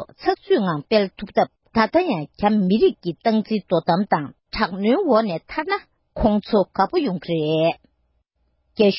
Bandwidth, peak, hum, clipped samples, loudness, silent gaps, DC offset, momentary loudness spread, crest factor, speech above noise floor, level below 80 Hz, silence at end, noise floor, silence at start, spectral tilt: 5.8 kHz; -4 dBFS; none; under 0.1%; -21 LUFS; none; under 0.1%; 7 LU; 16 dB; 48 dB; -46 dBFS; 0 s; -68 dBFS; 0 s; -10.5 dB/octave